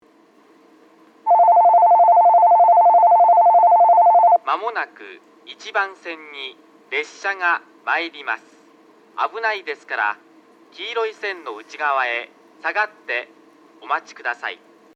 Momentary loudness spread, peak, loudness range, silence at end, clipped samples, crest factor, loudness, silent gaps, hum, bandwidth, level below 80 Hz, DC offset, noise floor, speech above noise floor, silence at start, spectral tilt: 19 LU; -6 dBFS; 13 LU; 0.4 s; under 0.1%; 12 dB; -17 LUFS; none; none; 7.2 kHz; under -90 dBFS; under 0.1%; -53 dBFS; 28 dB; 1.25 s; -1.5 dB/octave